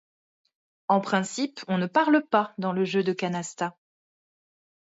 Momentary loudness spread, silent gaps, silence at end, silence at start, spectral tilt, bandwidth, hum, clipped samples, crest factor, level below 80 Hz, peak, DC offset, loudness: 10 LU; none; 1.15 s; 0.9 s; -5.5 dB/octave; 8 kHz; none; under 0.1%; 20 dB; -76 dBFS; -8 dBFS; under 0.1%; -26 LUFS